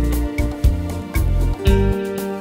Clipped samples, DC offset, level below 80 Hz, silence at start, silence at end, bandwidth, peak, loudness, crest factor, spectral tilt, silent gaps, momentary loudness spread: under 0.1%; under 0.1%; -20 dBFS; 0 s; 0 s; 16 kHz; -2 dBFS; -20 LUFS; 16 dB; -7 dB/octave; none; 7 LU